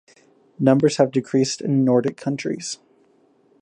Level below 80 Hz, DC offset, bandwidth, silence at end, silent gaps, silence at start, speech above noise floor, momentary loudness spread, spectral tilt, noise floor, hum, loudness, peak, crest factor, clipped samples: -68 dBFS; under 0.1%; 10.5 kHz; 0.85 s; none; 0.6 s; 39 dB; 11 LU; -6 dB/octave; -59 dBFS; none; -20 LUFS; -4 dBFS; 18 dB; under 0.1%